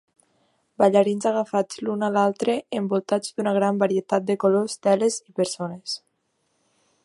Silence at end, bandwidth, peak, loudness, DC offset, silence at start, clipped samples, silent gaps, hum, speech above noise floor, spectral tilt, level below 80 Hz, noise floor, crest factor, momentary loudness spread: 1.1 s; 11.5 kHz; -4 dBFS; -23 LUFS; under 0.1%; 0.8 s; under 0.1%; none; none; 49 dB; -5 dB/octave; -72 dBFS; -72 dBFS; 20 dB; 8 LU